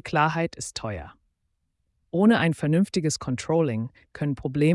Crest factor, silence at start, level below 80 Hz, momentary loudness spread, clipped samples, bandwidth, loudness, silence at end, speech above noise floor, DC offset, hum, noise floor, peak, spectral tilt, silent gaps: 16 dB; 0.05 s; -54 dBFS; 12 LU; under 0.1%; 12 kHz; -25 LUFS; 0 s; 51 dB; under 0.1%; none; -75 dBFS; -8 dBFS; -6 dB/octave; none